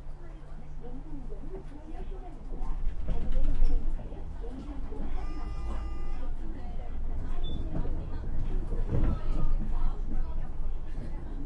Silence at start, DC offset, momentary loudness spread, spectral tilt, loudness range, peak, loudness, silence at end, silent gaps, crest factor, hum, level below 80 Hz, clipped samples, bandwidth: 0 s; under 0.1%; 12 LU; -8.5 dB/octave; 5 LU; -10 dBFS; -38 LUFS; 0 s; none; 16 dB; none; -30 dBFS; under 0.1%; 3.7 kHz